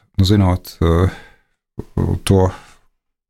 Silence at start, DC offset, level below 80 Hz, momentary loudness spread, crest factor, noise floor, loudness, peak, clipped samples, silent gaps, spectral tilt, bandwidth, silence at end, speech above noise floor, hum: 0.2 s; under 0.1%; -32 dBFS; 12 LU; 16 dB; -61 dBFS; -17 LUFS; -2 dBFS; under 0.1%; none; -7 dB/octave; 14.5 kHz; 0.75 s; 45 dB; none